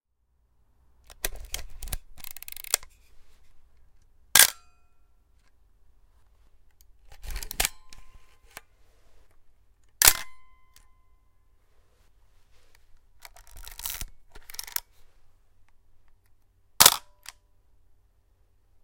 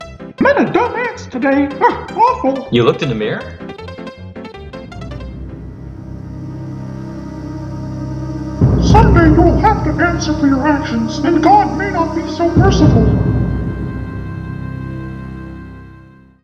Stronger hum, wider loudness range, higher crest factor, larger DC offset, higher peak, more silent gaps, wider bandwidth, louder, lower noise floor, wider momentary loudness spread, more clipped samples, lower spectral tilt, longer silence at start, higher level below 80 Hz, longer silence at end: neither; about the same, 14 LU vs 16 LU; first, 32 dB vs 14 dB; neither; about the same, 0 dBFS vs 0 dBFS; neither; first, 17 kHz vs 7.8 kHz; second, -23 LUFS vs -14 LUFS; first, -70 dBFS vs -41 dBFS; first, 30 LU vs 20 LU; neither; second, 1 dB/octave vs -7 dB/octave; first, 1.1 s vs 0 s; second, -46 dBFS vs -26 dBFS; first, 1.85 s vs 0.45 s